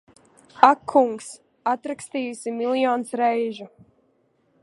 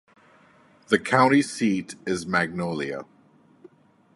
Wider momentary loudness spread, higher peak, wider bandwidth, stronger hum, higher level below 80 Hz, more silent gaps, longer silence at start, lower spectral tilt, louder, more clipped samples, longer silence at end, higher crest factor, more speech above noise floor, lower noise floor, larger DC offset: about the same, 13 LU vs 12 LU; first, 0 dBFS vs -4 dBFS; about the same, 11.5 kHz vs 11.5 kHz; neither; second, -70 dBFS vs -62 dBFS; neither; second, 0.55 s vs 0.9 s; about the same, -4 dB/octave vs -5 dB/octave; about the same, -22 LUFS vs -23 LUFS; neither; second, 0.95 s vs 1.15 s; about the same, 24 dB vs 22 dB; first, 43 dB vs 34 dB; first, -65 dBFS vs -57 dBFS; neither